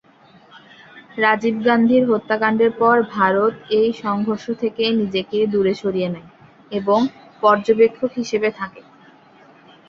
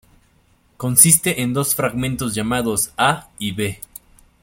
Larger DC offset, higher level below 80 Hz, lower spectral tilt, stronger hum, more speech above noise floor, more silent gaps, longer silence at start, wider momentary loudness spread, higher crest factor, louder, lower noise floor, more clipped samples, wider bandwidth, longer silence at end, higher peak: neither; second, -60 dBFS vs -48 dBFS; first, -6 dB/octave vs -3 dB/octave; neither; second, 32 dB vs 39 dB; neither; first, 0.95 s vs 0.8 s; second, 9 LU vs 15 LU; about the same, 18 dB vs 20 dB; about the same, -18 LUFS vs -17 LUFS; second, -50 dBFS vs -57 dBFS; neither; second, 7.2 kHz vs 17 kHz; first, 1.1 s vs 0.65 s; about the same, -2 dBFS vs 0 dBFS